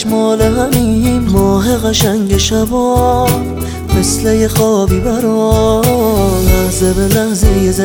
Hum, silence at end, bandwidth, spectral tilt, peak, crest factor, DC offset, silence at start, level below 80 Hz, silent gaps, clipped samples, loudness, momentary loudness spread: none; 0 s; over 20 kHz; -5.5 dB/octave; 0 dBFS; 10 dB; under 0.1%; 0 s; -20 dBFS; none; under 0.1%; -12 LUFS; 2 LU